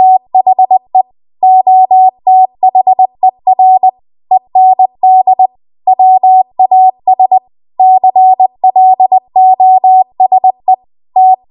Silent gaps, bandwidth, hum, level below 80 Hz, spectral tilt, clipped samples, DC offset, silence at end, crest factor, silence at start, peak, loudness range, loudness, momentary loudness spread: none; 1.1 kHz; none; -66 dBFS; -9.5 dB/octave; under 0.1%; under 0.1%; 0.15 s; 6 dB; 0 s; 0 dBFS; 1 LU; -8 LUFS; 7 LU